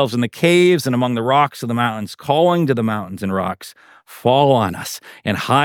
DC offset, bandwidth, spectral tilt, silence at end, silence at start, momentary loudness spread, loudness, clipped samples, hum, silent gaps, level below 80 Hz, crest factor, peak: under 0.1%; 18 kHz; -5.5 dB/octave; 0 s; 0 s; 13 LU; -17 LUFS; under 0.1%; none; none; -60 dBFS; 16 dB; -2 dBFS